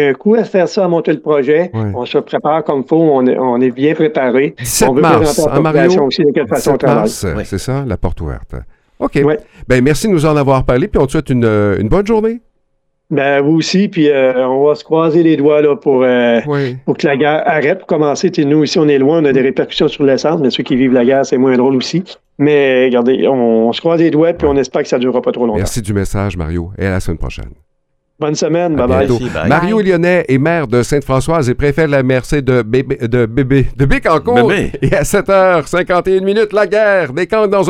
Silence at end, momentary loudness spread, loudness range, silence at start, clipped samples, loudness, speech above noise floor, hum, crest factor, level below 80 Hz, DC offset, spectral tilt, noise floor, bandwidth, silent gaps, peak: 0 s; 7 LU; 4 LU; 0 s; under 0.1%; -12 LUFS; 51 dB; none; 12 dB; -30 dBFS; under 0.1%; -6 dB/octave; -63 dBFS; 16.5 kHz; none; 0 dBFS